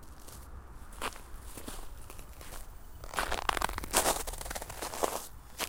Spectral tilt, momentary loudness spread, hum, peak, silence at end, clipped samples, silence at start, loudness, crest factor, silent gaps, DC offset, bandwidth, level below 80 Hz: -2 dB/octave; 20 LU; none; -8 dBFS; 0 s; under 0.1%; 0 s; -34 LUFS; 30 dB; none; under 0.1%; 17 kHz; -46 dBFS